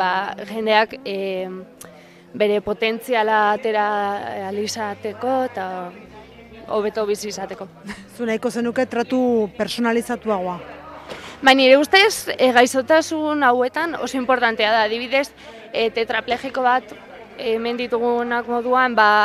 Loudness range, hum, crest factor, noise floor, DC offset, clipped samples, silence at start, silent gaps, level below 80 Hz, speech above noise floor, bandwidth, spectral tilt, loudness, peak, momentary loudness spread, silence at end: 9 LU; none; 20 dB; -42 dBFS; under 0.1%; under 0.1%; 0 s; none; -58 dBFS; 22 dB; 15 kHz; -3.5 dB/octave; -19 LUFS; 0 dBFS; 17 LU; 0 s